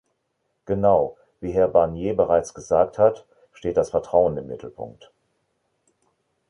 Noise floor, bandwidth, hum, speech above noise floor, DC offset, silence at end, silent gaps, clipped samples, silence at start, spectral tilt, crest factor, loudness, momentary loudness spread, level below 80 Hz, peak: -74 dBFS; 11 kHz; none; 53 dB; under 0.1%; 1.6 s; none; under 0.1%; 0.7 s; -7 dB/octave; 20 dB; -21 LUFS; 17 LU; -50 dBFS; -4 dBFS